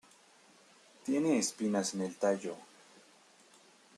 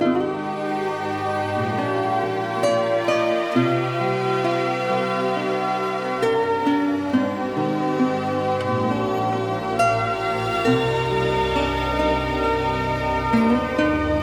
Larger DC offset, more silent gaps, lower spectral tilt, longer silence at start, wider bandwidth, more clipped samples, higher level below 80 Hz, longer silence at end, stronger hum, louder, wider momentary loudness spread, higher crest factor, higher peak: neither; neither; second, -4 dB/octave vs -6 dB/octave; first, 1.05 s vs 0 s; second, 13 kHz vs 19 kHz; neither; second, -84 dBFS vs -40 dBFS; first, 1.35 s vs 0 s; neither; second, -34 LUFS vs -22 LUFS; first, 14 LU vs 4 LU; about the same, 18 dB vs 14 dB; second, -18 dBFS vs -6 dBFS